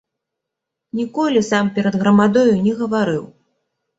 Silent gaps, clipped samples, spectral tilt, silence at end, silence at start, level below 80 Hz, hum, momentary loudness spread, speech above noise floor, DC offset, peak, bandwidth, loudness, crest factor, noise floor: none; under 0.1%; -6.5 dB/octave; 0.75 s; 0.95 s; -58 dBFS; none; 11 LU; 65 dB; under 0.1%; -2 dBFS; 8 kHz; -17 LUFS; 16 dB; -81 dBFS